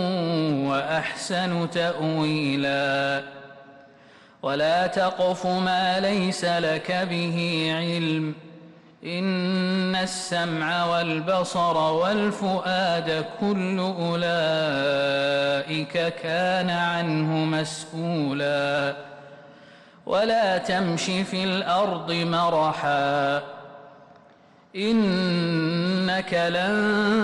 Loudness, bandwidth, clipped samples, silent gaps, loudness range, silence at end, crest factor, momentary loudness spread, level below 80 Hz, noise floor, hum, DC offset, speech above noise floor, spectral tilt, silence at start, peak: -24 LUFS; 12 kHz; under 0.1%; none; 2 LU; 0 s; 10 dB; 6 LU; -62 dBFS; -54 dBFS; none; under 0.1%; 30 dB; -5.5 dB/octave; 0 s; -14 dBFS